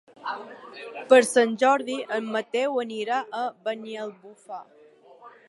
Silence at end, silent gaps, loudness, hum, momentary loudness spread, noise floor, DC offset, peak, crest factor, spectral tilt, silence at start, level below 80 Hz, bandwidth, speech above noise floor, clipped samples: 0.2 s; none; -24 LUFS; none; 22 LU; -51 dBFS; under 0.1%; -4 dBFS; 22 dB; -3 dB/octave; 0.2 s; -84 dBFS; 11.5 kHz; 26 dB; under 0.1%